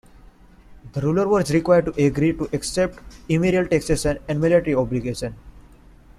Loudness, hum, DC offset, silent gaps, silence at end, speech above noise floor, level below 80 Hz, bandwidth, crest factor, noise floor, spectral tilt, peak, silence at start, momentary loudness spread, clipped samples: -21 LUFS; none; under 0.1%; none; 0.55 s; 28 dB; -40 dBFS; 13.5 kHz; 18 dB; -48 dBFS; -6 dB/octave; -4 dBFS; 0.7 s; 9 LU; under 0.1%